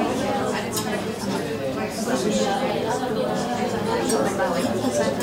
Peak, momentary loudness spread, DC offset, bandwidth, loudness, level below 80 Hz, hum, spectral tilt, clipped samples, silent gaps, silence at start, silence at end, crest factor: -10 dBFS; 5 LU; under 0.1%; 16 kHz; -24 LUFS; -52 dBFS; none; -4.5 dB/octave; under 0.1%; none; 0 s; 0 s; 14 dB